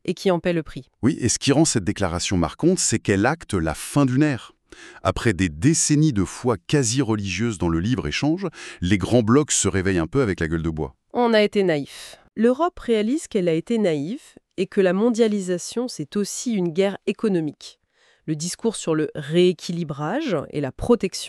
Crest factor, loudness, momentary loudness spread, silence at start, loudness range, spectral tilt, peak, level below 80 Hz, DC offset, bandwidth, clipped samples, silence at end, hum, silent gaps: 18 dB; -22 LUFS; 10 LU; 0.05 s; 4 LU; -5 dB/octave; -4 dBFS; -44 dBFS; under 0.1%; 13.5 kHz; under 0.1%; 0 s; none; none